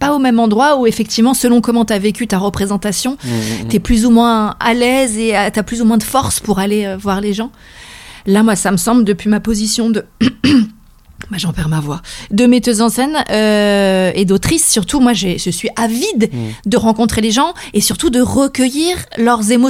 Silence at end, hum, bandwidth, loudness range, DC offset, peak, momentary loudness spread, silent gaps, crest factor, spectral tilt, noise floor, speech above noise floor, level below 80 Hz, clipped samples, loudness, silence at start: 0 s; none; 16 kHz; 3 LU; under 0.1%; 0 dBFS; 7 LU; none; 12 dB; -4.5 dB/octave; -36 dBFS; 23 dB; -34 dBFS; under 0.1%; -13 LUFS; 0 s